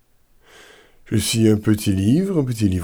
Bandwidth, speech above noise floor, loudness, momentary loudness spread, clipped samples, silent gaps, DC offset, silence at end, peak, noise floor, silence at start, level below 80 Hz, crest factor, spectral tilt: over 20 kHz; 37 dB; -19 LUFS; 5 LU; under 0.1%; none; under 0.1%; 0 s; -6 dBFS; -55 dBFS; 1.05 s; -46 dBFS; 14 dB; -6 dB/octave